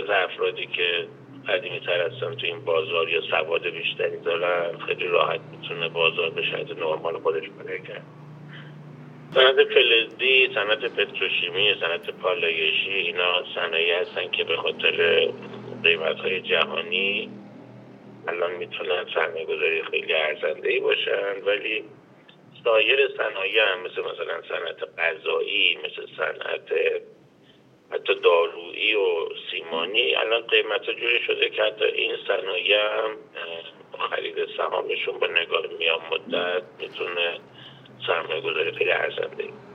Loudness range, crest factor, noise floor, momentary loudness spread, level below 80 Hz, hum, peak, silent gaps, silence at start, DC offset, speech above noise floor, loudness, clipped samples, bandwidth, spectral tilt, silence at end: 6 LU; 22 dB; -55 dBFS; 12 LU; -80 dBFS; none; -4 dBFS; none; 0 s; under 0.1%; 30 dB; -23 LUFS; under 0.1%; 6.2 kHz; -5 dB/octave; 0 s